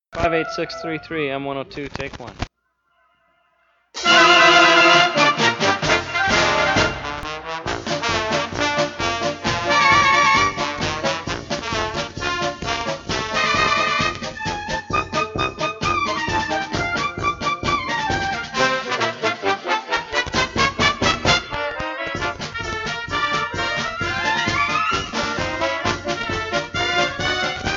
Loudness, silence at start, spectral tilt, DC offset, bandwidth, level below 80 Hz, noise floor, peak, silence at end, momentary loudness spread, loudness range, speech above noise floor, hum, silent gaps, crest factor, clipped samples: -19 LUFS; 0.1 s; -3 dB/octave; under 0.1%; 8 kHz; -42 dBFS; -68 dBFS; -2 dBFS; 0 s; 13 LU; 8 LU; 48 dB; none; none; 18 dB; under 0.1%